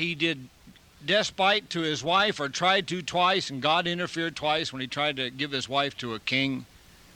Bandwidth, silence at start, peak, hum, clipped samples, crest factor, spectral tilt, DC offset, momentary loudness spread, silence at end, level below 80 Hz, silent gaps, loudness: 17 kHz; 0 s; -10 dBFS; none; under 0.1%; 18 dB; -3.5 dB/octave; under 0.1%; 7 LU; 0.5 s; -62 dBFS; none; -26 LUFS